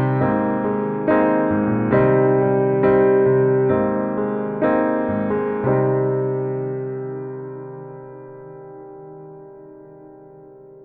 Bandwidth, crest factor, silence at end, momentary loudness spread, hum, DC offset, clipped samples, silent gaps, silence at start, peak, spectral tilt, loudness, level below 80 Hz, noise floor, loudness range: 3.7 kHz; 16 dB; 0 s; 22 LU; none; under 0.1%; under 0.1%; none; 0 s; -4 dBFS; -12.5 dB/octave; -19 LUFS; -52 dBFS; -43 dBFS; 18 LU